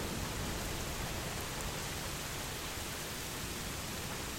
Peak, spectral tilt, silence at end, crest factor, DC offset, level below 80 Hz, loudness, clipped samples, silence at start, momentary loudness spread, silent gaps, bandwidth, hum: -22 dBFS; -3 dB/octave; 0 s; 16 dB; under 0.1%; -48 dBFS; -39 LUFS; under 0.1%; 0 s; 1 LU; none; 16.5 kHz; none